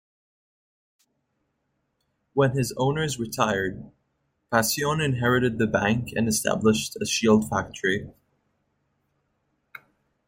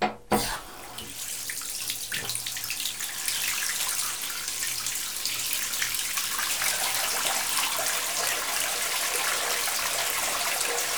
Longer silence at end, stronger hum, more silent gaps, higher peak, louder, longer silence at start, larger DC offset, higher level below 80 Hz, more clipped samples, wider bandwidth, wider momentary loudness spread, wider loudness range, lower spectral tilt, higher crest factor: first, 2.15 s vs 0 s; neither; neither; about the same, -6 dBFS vs -8 dBFS; about the same, -24 LUFS vs -26 LUFS; first, 2.35 s vs 0 s; second, under 0.1% vs 0.3%; about the same, -56 dBFS vs -56 dBFS; neither; second, 16.5 kHz vs over 20 kHz; about the same, 6 LU vs 6 LU; about the same, 5 LU vs 4 LU; first, -4.5 dB/octave vs 0 dB/octave; about the same, 20 dB vs 22 dB